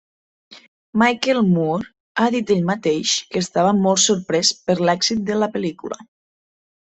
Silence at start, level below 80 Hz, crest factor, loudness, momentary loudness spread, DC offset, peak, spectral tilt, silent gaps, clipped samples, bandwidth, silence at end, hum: 0.5 s; -60 dBFS; 18 dB; -19 LUFS; 10 LU; under 0.1%; -2 dBFS; -4 dB/octave; 0.68-0.93 s, 2.00-2.15 s; under 0.1%; 8.4 kHz; 0.95 s; none